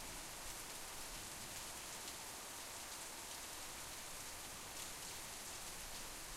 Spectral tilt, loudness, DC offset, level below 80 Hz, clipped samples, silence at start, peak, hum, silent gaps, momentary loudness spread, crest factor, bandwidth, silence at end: -1 dB/octave; -48 LUFS; under 0.1%; -62 dBFS; under 0.1%; 0 s; -30 dBFS; none; none; 1 LU; 20 dB; 16 kHz; 0 s